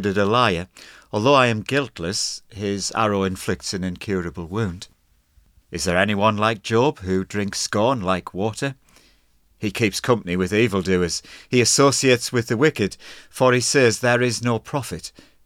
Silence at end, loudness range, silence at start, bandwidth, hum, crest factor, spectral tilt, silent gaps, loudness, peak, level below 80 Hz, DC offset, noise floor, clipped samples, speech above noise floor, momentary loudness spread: 0.35 s; 6 LU; 0 s; 17 kHz; none; 20 dB; -4 dB/octave; none; -21 LUFS; -2 dBFS; -50 dBFS; under 0.1%; -59 dBFS; under 0.1%; 38 dB; 12 LU